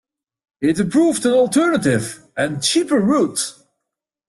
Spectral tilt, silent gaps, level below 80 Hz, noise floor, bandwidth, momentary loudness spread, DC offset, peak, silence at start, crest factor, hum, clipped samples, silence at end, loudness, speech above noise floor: -4.5 dB/octave; none; -56 dBFS; -81 dBFS; 12.5 kHz; 8 LU; under 0.1%; -4 dBFS; 0.6 s; 14 dB; none; under 0.1%; 0.75 s; -18 LUFS; 64 dB